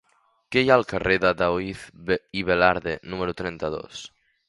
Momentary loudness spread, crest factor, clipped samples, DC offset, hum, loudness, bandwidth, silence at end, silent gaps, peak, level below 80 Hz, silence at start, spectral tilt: 15 LU; 22 dB; under 0.1%; under 0.1%; none; -23 LUFS; 11.5 kHz; 0.4 s; none; -2 dBFS; -48 dBFS; 0.5 s; -5.5 dB/octave